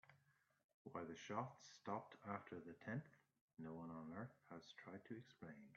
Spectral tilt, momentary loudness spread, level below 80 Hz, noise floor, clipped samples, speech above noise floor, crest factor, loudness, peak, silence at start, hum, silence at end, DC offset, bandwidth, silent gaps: -5.5 dB/octave; 10 LU; -90 dBFS; -81 dBFS; under 0.1%; 27 dB; 22 dB; -54 LUFS; -32 dBFS; 0.05 s; none; 0 s; under 0.1%; 7.4 kHz; 0.64-0.85 s, 3.41-3.48 s